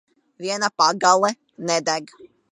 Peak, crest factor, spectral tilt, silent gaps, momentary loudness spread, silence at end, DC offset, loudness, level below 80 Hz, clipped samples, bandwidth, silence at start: -2 dBFS; 22 dB; -2 dB/octave; none; 12 LU; 0.25 s; under 0.1%; -20 LUFS; -76 dBFS; under 0.1%; 11 kHz; 0.4 s